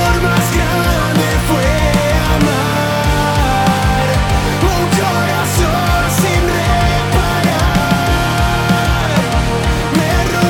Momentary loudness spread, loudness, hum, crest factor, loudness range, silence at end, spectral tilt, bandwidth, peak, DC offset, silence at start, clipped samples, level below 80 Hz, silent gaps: 1 LU; -13 LUFS; none; 10 dB; 0 LU; 0 s; -5 dB/octave; over 20 kHz; -2 dBFS; under 0.1%; 0 s; under 0.1%; -20 dBFS; none